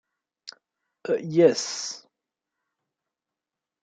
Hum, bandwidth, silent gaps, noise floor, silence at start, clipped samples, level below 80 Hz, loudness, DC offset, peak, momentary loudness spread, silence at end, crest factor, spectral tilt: none; 9.2 kHz; none; -88 dBFS; 0.45 s; under 0.1%; -78 dBFS; -24 LUFS; under 0.1%; -6 dBFS; 25 LU; 1.85 s; 24 dB; -4.5 dB/octave